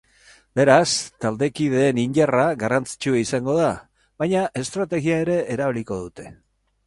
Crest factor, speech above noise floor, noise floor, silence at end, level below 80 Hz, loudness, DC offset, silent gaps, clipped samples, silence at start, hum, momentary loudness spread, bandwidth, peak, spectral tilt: 22 dB; 33 dB; -53 dBFS; 0.55 s; -54 dBFS; -21 LUFS; under 0.1%; none; under 0.1%; 0.55 s; none; 12 LU; 11.5 kHz; 0 dBFS; -5 dB/octave